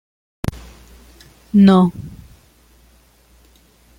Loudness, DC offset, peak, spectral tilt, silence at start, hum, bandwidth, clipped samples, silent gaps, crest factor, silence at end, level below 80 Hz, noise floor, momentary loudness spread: -15 LUFS; under 0.1%; -2 dBFS; -8 dB/octave; 0.45 s; none; 11 kHz; under 0.1%; none; 18 dB; 1.9 s; -44 dBFS; -52 dBFS; 23 LU